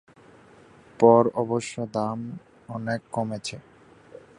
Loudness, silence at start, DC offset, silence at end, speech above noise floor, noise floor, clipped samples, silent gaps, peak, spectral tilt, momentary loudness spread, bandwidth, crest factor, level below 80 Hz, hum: -24 LUFS; 1 s; under 0.1%; 0.8 s; 29 dB; -52 dBFS; under 0.1%; none; -4 dBFS; -6.5 dB/octave; 21 LU; 11 kHz; 22 dB; -64 dBFS; none